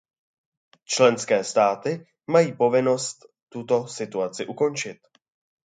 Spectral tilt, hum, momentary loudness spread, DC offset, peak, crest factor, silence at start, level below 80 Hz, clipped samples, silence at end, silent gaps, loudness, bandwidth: -4 dB/octave; none; 12 LU; under 0.1%; -4 dBFS; 20 dB; 0.9 s; -74 dBFS; under 0.1%; 0.7 s; 3.43-3.47 s; -23 LUFS; 9.4 kHz